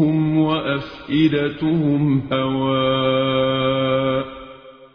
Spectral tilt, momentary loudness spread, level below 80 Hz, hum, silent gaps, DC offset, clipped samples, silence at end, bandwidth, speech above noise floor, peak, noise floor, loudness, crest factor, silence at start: -9 dB/octave; 7 LU; -48 dBFS; none; none; under 0.1%; under 0.1%; 0.1 s; 5.4 kHz; 23 dB; -6 dBFS; -41 dBFS; -19 LUFS; 14 dB; 0 s